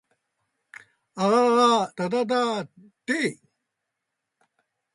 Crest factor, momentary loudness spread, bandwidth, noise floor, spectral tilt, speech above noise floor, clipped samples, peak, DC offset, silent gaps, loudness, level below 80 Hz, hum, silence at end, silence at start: 18 dB; 18 LU; 11.5 kHz; -82 dBFS; -4.5 dB/octave; 60 dB; under 0.1%; -8 dBFS; under 0.1%; none; -23 LUFS; -74 dBFS; none; 1.6 s; 1.15 s